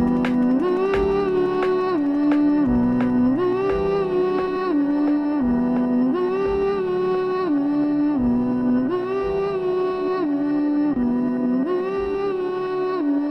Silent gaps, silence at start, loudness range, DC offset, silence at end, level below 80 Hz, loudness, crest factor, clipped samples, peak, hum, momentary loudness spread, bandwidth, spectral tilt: none; 0 s; 2 LU; under 0.1%; 0 s; -44 dBFS; -21 LUFS; 12 dB; under 0.1%; -8 dBFS; none; 4 LU; 6 kHz; -8.5 dB/octave